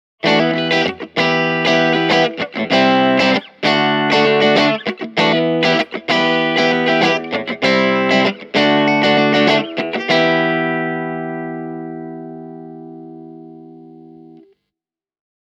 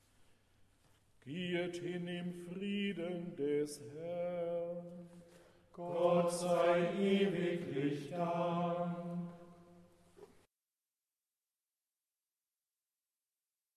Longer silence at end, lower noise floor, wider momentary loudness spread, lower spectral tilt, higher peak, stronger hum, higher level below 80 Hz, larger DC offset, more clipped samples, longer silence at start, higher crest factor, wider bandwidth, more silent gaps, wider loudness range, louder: second, 1.15 s vs 3.5 s; about the same, -87 dBFS vs under -90 dBFS; about the same, 15 LU vs 14 LU; about the same, -5 dB/octave vs -6 dB/octave; first, 0 dBFS vs -20 dBFS; neither; first, -62 dBFS vs -78 dBFS; neither; neither; second, 0.25 s vs 1.25 s; about the same, 16 dB vs 20 dB; second, 10.5 kHz vs 13 kHz; neither; first, 13 LU vs 8 LU; first, -15 LUFS vs -37 LUFS